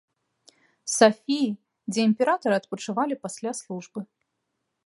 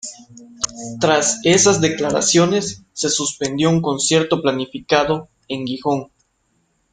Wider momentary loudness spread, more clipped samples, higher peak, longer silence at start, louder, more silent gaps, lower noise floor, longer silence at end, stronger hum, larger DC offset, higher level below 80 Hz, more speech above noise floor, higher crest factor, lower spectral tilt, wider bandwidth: first, 17 LU vs 11 LU; neither; about the same, -2 dBFS vs -2 dBFS; first, 0.85 s vs 0.05 s; second, -25 LUFS vs -18 LUFS; neither; first, -79 dBFS vs -65 dBFS; about the same, 0.8 s vs 0.9 s; neither; neither; second, -78 dBFS vs -54 dBFS; first, 55 dB vs 48 dB; first, 24 dB vs 18 dB; about the same, -4 dB/octave vs -3.5 dB/octave; first, 11.5 kHz vs 10 kHz